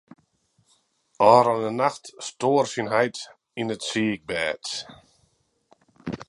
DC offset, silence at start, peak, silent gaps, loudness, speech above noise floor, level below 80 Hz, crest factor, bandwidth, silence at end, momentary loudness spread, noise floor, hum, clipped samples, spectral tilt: under 0.1%; 1.2 s; -2 dBFS; none; -23 LUFS; 45 dB; -64 dBFS; 24 dB; 11.5 kHz; 0.05 s; 19 LU; -68 dBFS; none; under 0.1%; -4.5 dB/octave